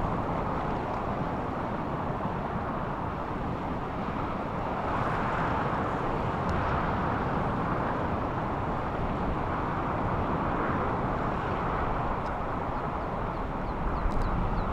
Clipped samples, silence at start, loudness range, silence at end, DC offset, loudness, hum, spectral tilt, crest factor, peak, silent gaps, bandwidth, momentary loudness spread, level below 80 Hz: under 0.1%; 0 s; 3 LU; 0 s; under 0.1%; -31 LUFS; none; -8 dB/octave; 14 dB; -16 dBFS; none; 9.2 kHz; 4 LU; -38 dBFS